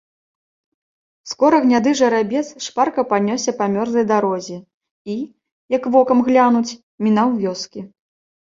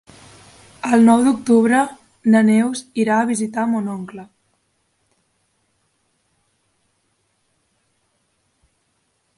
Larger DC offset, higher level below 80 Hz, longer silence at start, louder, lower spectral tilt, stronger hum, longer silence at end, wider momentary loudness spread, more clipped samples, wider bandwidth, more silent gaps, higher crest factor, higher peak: neither; about the same, -62 dBFS vs -64 dBFS; first, 1.25 s vs 0.85 s; about the same, -17 LUFS vs -17 LUFS; about the same, -5 dB/octave vs -5.5 dB/octave; neither; second, 0.7 s vs 5.15 s; about the same, 16 LU vs 15 LU; neither; second, 7.6 kHz vs 11.5 kHz; first, 4.74-4.81 s, 4.91-5.05 s, 5.52-5.69 s, 6.83-6.98 s vs none; about the same, 16 dB vs 18 dB; about the same, -2 dBFS vs -2 dBFS